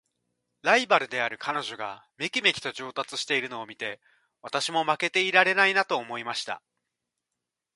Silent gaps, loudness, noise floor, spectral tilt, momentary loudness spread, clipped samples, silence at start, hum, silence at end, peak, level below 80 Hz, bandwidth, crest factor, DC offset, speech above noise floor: none; -25 LUFS; -86 dBFS; -2 dB/octave; 15 LU; under 0.1%; 0.65 s; none; 1.2 s; -4 dBFS; -76 dBFS; 11.5 kHz; 24 dB; under 0.1%; 59 dB